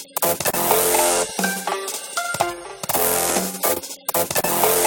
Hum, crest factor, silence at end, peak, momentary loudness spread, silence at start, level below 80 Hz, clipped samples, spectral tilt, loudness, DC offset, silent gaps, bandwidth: none; 20 dB; 0 s; -2 dBFS; 9 LU; 0 s; -54 dBFS; under 0.1%; -2 dB/octave; -20 LUFS; under 0.1%; none; 19 kHz